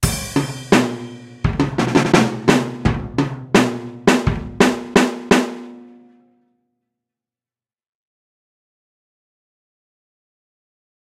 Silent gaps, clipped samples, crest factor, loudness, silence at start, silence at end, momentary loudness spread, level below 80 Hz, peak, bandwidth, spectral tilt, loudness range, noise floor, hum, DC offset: none; under 0.1%; 20 dB; -18 LUFS; 0 s; 5.15 s; 10 LU; -38 dBFS; 0 dBFS; 16 kHz; -5 dB/octave; 5 LU; under -90 dBFS; none; under 0.1%